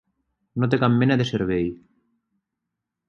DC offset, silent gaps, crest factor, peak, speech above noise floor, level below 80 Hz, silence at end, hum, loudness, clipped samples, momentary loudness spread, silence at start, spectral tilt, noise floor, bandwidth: under 0.1%; none; 20 dB; -4 dBFS; 62 dB; -52 dBFS; 1.35 s; none; -22 LUFS; under 0.1%; 10 LU; 0.55 s; -7.5 dB/octave; -83 dBFS; 7 kHz